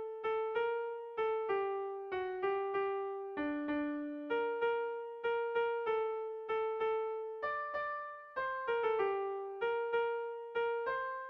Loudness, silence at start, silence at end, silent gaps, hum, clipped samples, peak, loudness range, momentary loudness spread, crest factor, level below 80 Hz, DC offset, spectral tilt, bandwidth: -37 LUFS; 0 s; 0 s; none; none; under 0.1%; -24 dBFS; 1 LU; 6 LU; 14 dB; -74 dBFS; under 0.1%; -1.5 dB/octave; 5.4 kHz